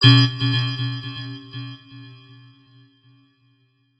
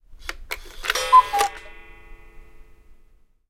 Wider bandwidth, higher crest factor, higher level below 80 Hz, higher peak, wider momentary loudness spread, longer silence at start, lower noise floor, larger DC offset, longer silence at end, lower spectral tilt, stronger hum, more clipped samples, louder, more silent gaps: second, 8 kHz vs 17 kHz; about the same, 22 dB vs 22 dB; second, -56 dBFS vs -44 dBFS; about the same, 0 dBFS vs -2 dBFS; first, 27 LU vs 21 LU; about the same, 0 s vs 0.1 s; first, -63 dBFS vs -54 dBFS; neither; first, 1.85 s vs 0.9 s; first, -6 dB/octave vs -0.5 dB/octave; neither; neither; about the same, -21 LUFS vs -19 LUFS; neither